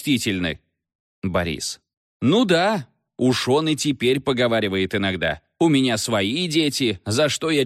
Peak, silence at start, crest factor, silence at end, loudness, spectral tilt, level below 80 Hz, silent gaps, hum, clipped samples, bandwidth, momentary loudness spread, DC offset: -4 dBFS; 0 s; 16 dB; 0 s; -21 LUFS; -4.5 dB/octave; -52 dBFS; 0.95-1.22 s, 1.97-2.20 s; none; under 0.1%; 15.5 kHz; 10 LU; under 0.1%